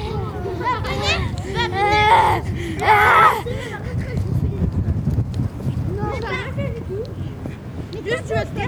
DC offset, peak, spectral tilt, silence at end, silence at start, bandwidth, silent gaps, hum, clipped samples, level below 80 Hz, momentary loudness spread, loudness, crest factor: under 0.1%; 0 dBFS; -6 dB/octave; 0 s; 0 s; over 20 kHz; none; none; under 0.1%; -34 dBFS; 15 LU; -20 LUFS; 20 dB